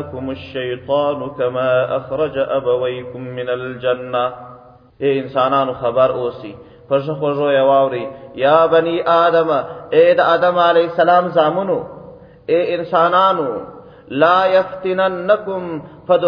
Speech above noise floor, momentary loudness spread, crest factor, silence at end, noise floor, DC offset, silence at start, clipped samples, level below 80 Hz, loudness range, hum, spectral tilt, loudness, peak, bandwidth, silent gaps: 23 dB; 13 LU; 16 dB; 0 s; -39 dBFS; under 0.1%; 0 s; under 0.1%; -56 dBFS; 6 LU; none; -8 dB/octave; -16 LUFS; 0 dBFS; 5.2 kHz; none